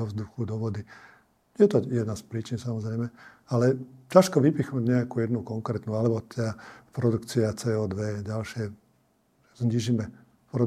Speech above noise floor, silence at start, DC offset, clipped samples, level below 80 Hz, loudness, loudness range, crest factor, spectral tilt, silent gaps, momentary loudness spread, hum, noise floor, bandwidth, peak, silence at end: 40 dB; 0 s; under 0.1%; under 0.1%; -64 dBFS; -27 LUFS; 5 LU; 26 dB; -7 dB/octave; none; 13 LU; none; -67 dBFS; 14.5 kHz; -2 dBFS; 0 s